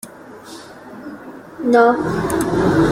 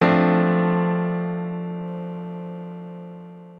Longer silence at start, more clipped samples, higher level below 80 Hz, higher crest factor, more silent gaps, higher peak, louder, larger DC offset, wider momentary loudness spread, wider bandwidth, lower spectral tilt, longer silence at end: about the same, 0.05 s vs 0 s; neither; first, -42 dBFS vs -64 dBFS; about the same, 16 dB vs 18 dB; neither; about the same, -2 dBFS vs -4 dBFS; first, -16 LUFS vs -23 LUFS; neither; first, 23 LU vs 19 LU; first, 16 kHz vs 5.2 kHz; second, -6.5 dB/octave vs -10 dB/octave; about the same, 0 s vs 0 s